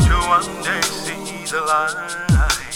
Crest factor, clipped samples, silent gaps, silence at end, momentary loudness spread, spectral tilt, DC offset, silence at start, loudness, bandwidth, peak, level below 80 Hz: 14 dB; under 0.1%; none; 0 s; 9 LU; -4 dB/octave; under 0.1%; 0 s; -19 LUFS; 18.5 kHz; -4 dBFS; -24 dBFS